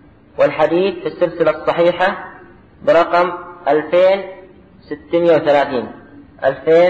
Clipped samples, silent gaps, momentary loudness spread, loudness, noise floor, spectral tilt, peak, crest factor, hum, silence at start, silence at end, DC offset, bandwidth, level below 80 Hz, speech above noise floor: under 0.1%; none; 17 LU; -16 LUFS; -42 dBFS; -7 dB/octave; -4 dBFS; 12 dB; none; 0.4 s; 0 s; under 0.1%; 7.6 kHz; -52 dBFS; 28 dB